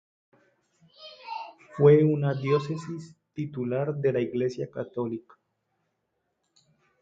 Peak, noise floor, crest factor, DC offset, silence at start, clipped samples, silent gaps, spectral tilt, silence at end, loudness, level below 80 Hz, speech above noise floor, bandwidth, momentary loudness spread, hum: -8 dBFS; -78 dBFS; 22 dB; under 0.1%; 1 s; under 0.1%; none; -8.5 dB/octave; 1.8 s; -26 LUFS; -70 dBFS; 53 dB; 7.8 kHz; 21 LU; none